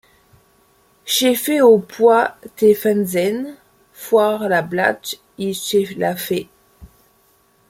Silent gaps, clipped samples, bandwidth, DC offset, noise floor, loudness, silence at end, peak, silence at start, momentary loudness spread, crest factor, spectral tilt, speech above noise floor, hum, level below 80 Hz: none; under 0.1%; 16.5 kHz; under 0.1%; -57 dBFS; -17 LUFS; 0.85 s; -2 dBFS; 1.05 s; 13 LU; 16 dB; -4 dB/octave; 41 dB; none; -58 dBFS